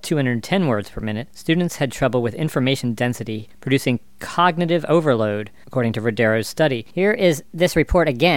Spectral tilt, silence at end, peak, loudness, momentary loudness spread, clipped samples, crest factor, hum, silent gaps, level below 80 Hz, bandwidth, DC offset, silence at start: -6 dB/octave; 0 s; -2 dBFS; -20 LUFS; 10 LU; under 0.1%; 18 dB; none; none; -40 dBFS; 17 kHz; 0.8%; 0.05 s